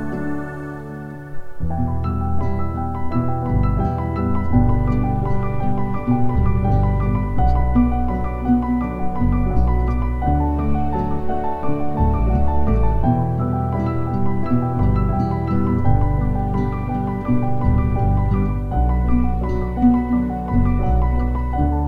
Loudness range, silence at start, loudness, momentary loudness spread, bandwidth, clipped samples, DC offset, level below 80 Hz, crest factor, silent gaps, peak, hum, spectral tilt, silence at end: 2 LU; 0 s; -20 LUFS; 6 LU; 4.7 kHz; under 0.1%; under 0.1%; -24 dBFS; 16 dB; none; -2 dBFS; none; -11 dB/octave; 0 s